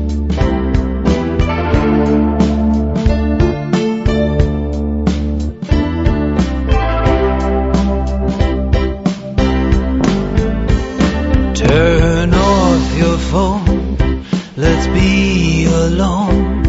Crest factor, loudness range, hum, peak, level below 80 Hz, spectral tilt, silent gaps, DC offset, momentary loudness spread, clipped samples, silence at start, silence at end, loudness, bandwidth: 12 dB; 3 LU; none; 0 dBFS; -18 dBFS; -7 dB/octave; none; under 0.1%; 5 LU; under 0.1%; 0 s; 0 s; -14 LUFS; 8 kHz